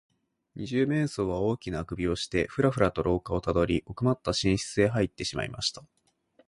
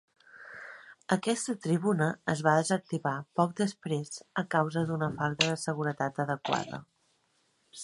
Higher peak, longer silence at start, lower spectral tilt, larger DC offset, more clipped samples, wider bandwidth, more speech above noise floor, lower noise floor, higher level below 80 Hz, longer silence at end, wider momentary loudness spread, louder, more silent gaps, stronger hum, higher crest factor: about the same, -10 dBFS vs -8 dBFS; first, 0.55 s vs 0.35 s; about the same, -5.5 dB/octave vs -5 dB/octave; neither; neither; about the same, 11.5 kHz vs 11.5 kHz; second, 38 dB vs 42 dB; second, -65 dBFS vs -72 dBFS; first, -46 dBFS vs -70 dBFS; first, 0.65 s vs 0 s; second, 6 LU vs 18 LU; about the same, -28 LUFS vs -30 LUFS; neither; neither; second, 18 dB vs 24 dB